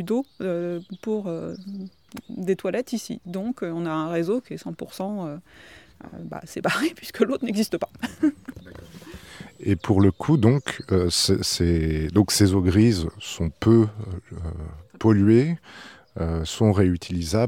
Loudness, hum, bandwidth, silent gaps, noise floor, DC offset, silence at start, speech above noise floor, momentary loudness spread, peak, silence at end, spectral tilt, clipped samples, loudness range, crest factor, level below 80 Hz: -23 LUFS; none; 17 kHz; none; -43 dBFS; under 0.1%; 0 s; 20 dB; 21 LU; -4 dBFS; 0 s; -6 dB/octave; under 0.1%; 9 LU; 20 dB; -42 dBFS